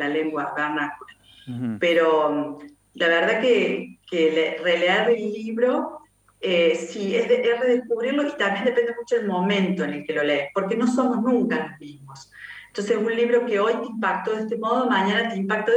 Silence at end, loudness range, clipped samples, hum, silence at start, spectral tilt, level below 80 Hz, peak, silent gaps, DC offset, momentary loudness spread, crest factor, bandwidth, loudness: 0 s; 3 LU; under 0.1%; none; 0 s; -5.5 dB/octave; -70 dBFS; -8 dBFS; none; under 0.1%; 11 LU; 16 dB; 9.6 kHz; -22 LUFS